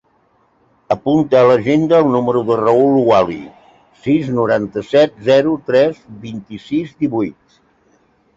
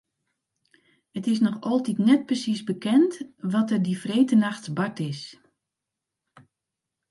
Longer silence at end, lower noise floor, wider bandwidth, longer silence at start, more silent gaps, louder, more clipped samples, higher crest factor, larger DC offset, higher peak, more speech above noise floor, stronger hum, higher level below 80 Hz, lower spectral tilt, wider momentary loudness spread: second, 1.05 s vs 1.8 s; second, -57 dBFS vs -86 dBFS; second, 7.8 kHz vs 11.5 kHz; second, 0.9 s vs 1.15 s; neither; first, -14 LUFS vs -24 LUFS; neither; about the same, 14 dB vs 18 dB; neither; first, -2 dBFS vs -8 dBFS; second, 43 dB vs 62 dB; neither; first, -52 dBFS vs -74 dBFS; about the same, -7.5 dB/octave vs -6.5 dB/octave; about the same, 14 LU vs 12 LU